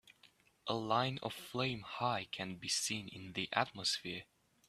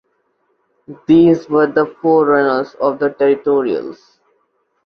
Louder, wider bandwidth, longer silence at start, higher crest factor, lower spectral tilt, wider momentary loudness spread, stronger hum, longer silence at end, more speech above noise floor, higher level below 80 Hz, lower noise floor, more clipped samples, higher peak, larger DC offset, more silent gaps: second, -38 LUFS vs -14 LUFS; first, 15.5 kHz vs 6.4 kHz; second, 0.05 s vs 0.9 s; first, 26 dB vs 14 dB; second, -3 dB/octave vs -8.5 dB/octave; about the same, 9 LU vs 10 LU; neither; second, 0.45 s vs 0.9 s; second, 29 dB vs 50 dB; second, -74 dBFS vs -56 dBFS; first, -68 dBFS vs -64 dBFS; neither; second, -14 dBFS vs -2 dBFS; neither; neither